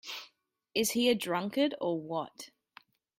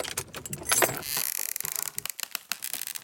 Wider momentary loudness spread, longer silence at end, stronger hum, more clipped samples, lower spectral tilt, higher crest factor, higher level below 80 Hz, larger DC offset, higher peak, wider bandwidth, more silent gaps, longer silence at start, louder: first, 16 LU vs 11 LU; first, 0.7 s vs 0 s; neither; neither; first, -3.5 dB/octave vs -1 dB/octave; second, 18 dB vs 28 dB; second, -76 dBFS vs -62 dBFS; neither; second, -16 dBFS vs -4 dBFS; about the same, 16 kHz vs 17.5 kHz; neither; about the same, 0.05 s vs 0 s; about the same, -31 LUFS vs -29 LUFS